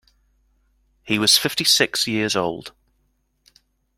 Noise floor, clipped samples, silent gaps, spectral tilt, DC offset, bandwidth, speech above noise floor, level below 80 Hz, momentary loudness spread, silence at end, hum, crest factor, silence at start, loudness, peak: -67 dBFS; under 0.1%; none; -2 dB/octave; under 0.1%; 16.5 kHz; 47 dB; -60 dBFS; 10 LU; 1.3 s; none; 24 dB; 1.05 s; -18 LUFS; 0 dBFS